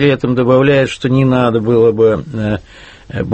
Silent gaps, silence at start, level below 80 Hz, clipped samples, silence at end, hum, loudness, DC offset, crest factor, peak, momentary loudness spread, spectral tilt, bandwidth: none; 0 s; -40 dBFS; under 0.1%; 0 s; none; -13 LUFS; under 0.1%; 12 dB; 0 dBFS; 11 LU; -7.5 dB/octave; 8.6 kHz